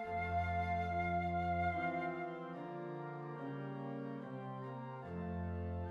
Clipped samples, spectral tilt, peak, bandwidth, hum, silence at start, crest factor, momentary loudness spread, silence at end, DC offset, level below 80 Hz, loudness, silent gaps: under 0.1%; -8.5 dB/octave; -26 dBFS; 6.8 kHz; none; 0 s; 14 dB; 9 LU; 0 s; under 0.1%; -58 dBFS; -41 LUFS; none